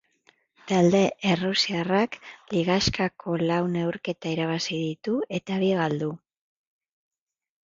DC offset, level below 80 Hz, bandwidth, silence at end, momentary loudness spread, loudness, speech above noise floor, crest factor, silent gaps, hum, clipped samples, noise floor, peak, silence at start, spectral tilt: under 0.1%; -54 dBFS; 7.6 kHz; 1.5 s; 8 LU; -25 LUFS; 39 dB; 18 dB; none; none; under 0.1%; -64 dBFS; -8 dBFS; 0.65 s; -5.5 dB/octave